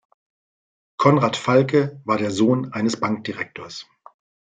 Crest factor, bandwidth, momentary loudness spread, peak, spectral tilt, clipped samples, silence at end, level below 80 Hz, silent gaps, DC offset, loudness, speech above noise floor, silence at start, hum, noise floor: 20 dB; 9.4 kHz; 17 LU; -2 dBFS; -6 dB/octave; under 0.1%; 0.8 s; -64 dBFS; none; under 0.1%; -20 LUFS; over 70 dB; 1 s; none; under -90 dBFS